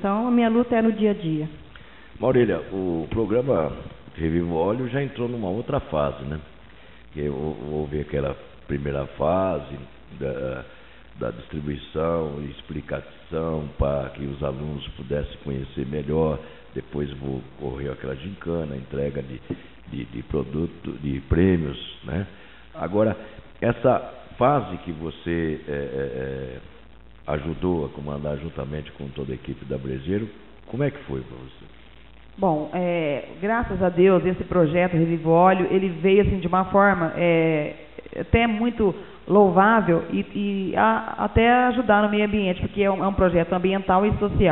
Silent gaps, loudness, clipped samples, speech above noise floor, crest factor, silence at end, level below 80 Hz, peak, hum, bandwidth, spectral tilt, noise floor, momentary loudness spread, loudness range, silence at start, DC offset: none; -24 LUFS; under 0.1%; 25 dB; 20 dB; 0 s; -40 dBFS; -4 dBFS; none; 4.2 kHz; -6 dB/octave; -48 dBFS; 15 LU; 10 LU; 0 s; 0.4%